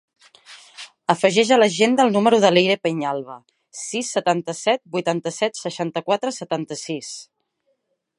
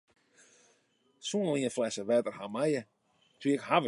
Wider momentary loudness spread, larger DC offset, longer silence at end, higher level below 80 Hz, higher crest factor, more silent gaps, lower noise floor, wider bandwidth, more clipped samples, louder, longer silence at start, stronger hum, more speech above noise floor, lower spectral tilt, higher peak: first, 18 LU vs 7 LU; neither; first, 0.95 s vs 0 s; first, -74 dBFS vs -80 dBFS; about the same, 20 dB vs 22 dB; neither; about the same, -71 dBFS vs -71 dBFS; about the same, 11.5 kHz vs 11.5 kHz; neither; first, -20 LUFS vs -32 LUFS; second, 0.5 s vs 1.25 s; neither; first, 51 dB vs 41 dB; about the same, -4 dB/octave vs -5 dB/octave; first, -2 dBFS vs -12 dBFS